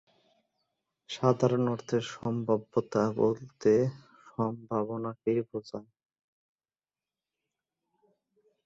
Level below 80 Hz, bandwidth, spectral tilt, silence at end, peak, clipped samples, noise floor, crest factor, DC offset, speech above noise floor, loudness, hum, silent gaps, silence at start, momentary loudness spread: -70 dBFS; 7.8 kHz; -7 dB/octave; 2.85 s; -8 dBFS; under 0.1%; under -90 dBFS; 24 dB; under 0.1%; over 61 dB; -30 LUFS; none; none; 1.1 s; 13 LU